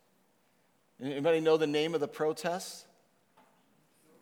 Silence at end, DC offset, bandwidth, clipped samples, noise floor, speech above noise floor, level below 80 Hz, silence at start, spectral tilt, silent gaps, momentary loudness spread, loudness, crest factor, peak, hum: 1.4 s; under 0.1%; 17 kHz; under 0.1%; -71 dBFS; 41 dB; under -90 dBFS; 1 s; -4.5 dB/octave; none; 16 LU; -31 LUFS; 20 dB; -14 dBFS; none